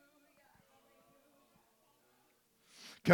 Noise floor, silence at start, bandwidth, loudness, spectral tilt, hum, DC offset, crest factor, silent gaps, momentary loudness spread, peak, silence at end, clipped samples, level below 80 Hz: -73 dBFS; 3.05 s; 19 kHz; -44 LUFS; -6.5 dB/octave; none; under 0.1%; 30 dB; none; 16 LU; -10 dBFS; 0 s; under 0.1%; -78 dBFS